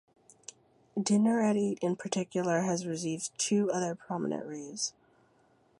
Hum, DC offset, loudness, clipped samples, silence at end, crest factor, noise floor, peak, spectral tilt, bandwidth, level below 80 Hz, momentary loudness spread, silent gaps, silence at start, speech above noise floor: none; under 0.1%; -31 LUFS; under 0.1%; 0.9 s; 18 dB; -67 dBFS; -14 dBFS; -4.5 dB/octave; 11.5 kHz; -78 dBFS; 13 LU; none; 0.95 s; 36 dB